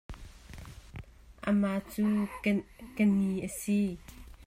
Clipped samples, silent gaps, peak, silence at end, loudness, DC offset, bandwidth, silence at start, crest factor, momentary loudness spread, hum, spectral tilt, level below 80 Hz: under 0.1%; none; -14 dBFS; 0 s; -31 LUFS; under 0.1%; 16 kHz; 0.1 s; 18 dB; 21 LU; none; -6.5 dB/octave; -52 dBFS